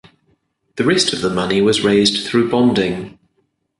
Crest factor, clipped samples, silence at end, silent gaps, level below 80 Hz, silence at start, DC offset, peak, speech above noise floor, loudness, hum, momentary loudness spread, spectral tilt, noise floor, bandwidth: 16 dB; under 0.1%; 0.7 s; none; -50 dBFS; 0.75 s; under 0.1%; -2 dBFS; 51 dB; -15 LUFS; none; 11 LU; -4.5 dB/octave; -66 dBFS; 11.5 kHz